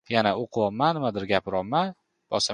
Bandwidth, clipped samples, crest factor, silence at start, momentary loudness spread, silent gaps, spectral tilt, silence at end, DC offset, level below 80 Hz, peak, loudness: 11 kHz; under 0.1%; 22 dB; 0.1 s; 5 LU; none; -4.5 dB/octave; 0 s; under 0.1%; -58 dBFS; -4 dBFS; -26 LUFS